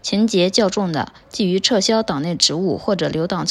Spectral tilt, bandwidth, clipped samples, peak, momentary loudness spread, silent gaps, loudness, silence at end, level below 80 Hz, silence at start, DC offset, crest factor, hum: -4 dB/octave; 12 kHz; under 0.1%; 0 dBFS; 7 LU; none; -18 LUFS; 0 s; -52 dBFS; 0.05 s; under 0.1%; 18 dB; none